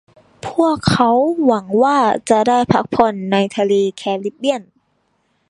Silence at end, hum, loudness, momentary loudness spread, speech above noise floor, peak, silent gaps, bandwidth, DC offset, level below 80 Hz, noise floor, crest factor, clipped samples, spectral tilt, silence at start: 0.9 s; none; -16 LUFS; 8 LU; 49 dB; 0 dBFS; none; 11.5 kHz; under 0.1%; -48 dBFS; -64 dBFS; 16 dB; under 0.1%; -6 dB/octave; 0.45 s